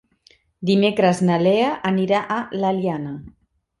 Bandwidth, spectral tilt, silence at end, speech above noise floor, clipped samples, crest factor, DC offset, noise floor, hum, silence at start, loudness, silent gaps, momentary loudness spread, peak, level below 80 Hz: 11.5 kHz; -6.5 dB/octave; 0.5 s; 38 dB; under 0.1%; 16 dB; under 0.1%; -57 dBFS; none; 0.6 s; -20 LUFS; none; 11 LU; -4 dBFS; -58 dBFS